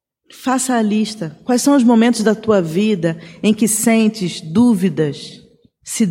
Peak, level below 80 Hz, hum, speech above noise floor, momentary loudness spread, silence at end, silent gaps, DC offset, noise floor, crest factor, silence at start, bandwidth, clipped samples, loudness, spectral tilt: -2 dBFS; -58 dBFS; none; 24 dB; 11 LU; 0 s; none; under 0.1%; -39 dBFS; 14 dB; 0.4 s; 16.5 kHz; under 0.1%; -16 LUFS; -5 dB/octave